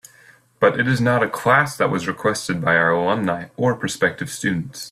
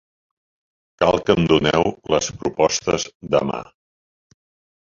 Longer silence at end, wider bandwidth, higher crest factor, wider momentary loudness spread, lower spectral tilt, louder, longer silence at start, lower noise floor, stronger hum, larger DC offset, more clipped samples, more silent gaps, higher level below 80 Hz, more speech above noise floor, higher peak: second, 0 s vs 1.2 s; first, 15 kHz vs 7.6 kHz; about the same, 18 dB vs 22 dB; about the same, 7 LU vs 8 LU; about the same, -5 dB/octave vs -4.5 dB/octave; about the same, -20 LUFS vs -19 LUFS; second, 0.6 s vs 1 s; second, -51 dBFS vs under -90 dBFS; neither; neither; neither; second, none vs 3.15-3.20 s; second, -56 dBFS vs -46 dBFS; second, 32 dB vs over 71 dB; about the same, -2 dBFS vs 0 dBFS